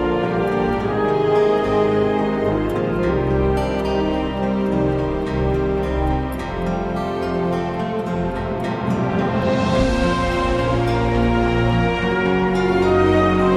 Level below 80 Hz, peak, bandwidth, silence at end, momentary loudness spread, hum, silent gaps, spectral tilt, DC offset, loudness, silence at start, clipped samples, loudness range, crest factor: -30 dBFS; -4 dBFS; 13.5 kHz; 0 s; 6 LU; none; none; -7.5 dB/octave; under 0.1%; -19 LUFS; 0 s; under 0.1%; 4 LU; 14 dB